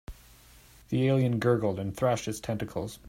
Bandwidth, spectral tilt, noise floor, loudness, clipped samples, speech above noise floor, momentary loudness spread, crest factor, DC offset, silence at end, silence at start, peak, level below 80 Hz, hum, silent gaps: 16 kHz; -6.5 dB/octave; -55 dBFS; -29 LUFS; under 0.1%; 27 dB; 8 LU; 18 dB; under 0.1%; 0 s; 0.1 s; -10 dBFS; -54 dBFS; none; none